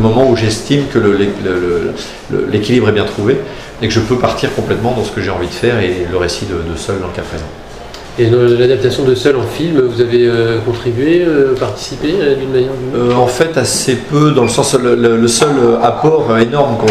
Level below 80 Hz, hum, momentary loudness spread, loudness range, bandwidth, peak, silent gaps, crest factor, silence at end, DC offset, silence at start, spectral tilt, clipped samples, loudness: -34 dBFS; none; 9 LU; 5 LU; 15 kHz; 0 dBFS; none; 12 dB; 0 s; under 0.1%; 0 s; -5.5 dB/octave; under 0.1%; -12 LUFS